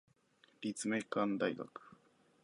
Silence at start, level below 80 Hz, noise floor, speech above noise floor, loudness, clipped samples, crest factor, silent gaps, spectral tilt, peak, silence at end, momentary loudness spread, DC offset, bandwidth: 0.6 s; -84 dBFS; -71 dBFS; 33 dB; -38 LUFS; under 0.1%; 20 dB; none; -4.5 dB/octave; -22 dBFS; 0.5 s; 13 LU; under 0.1%; 11.5 kHz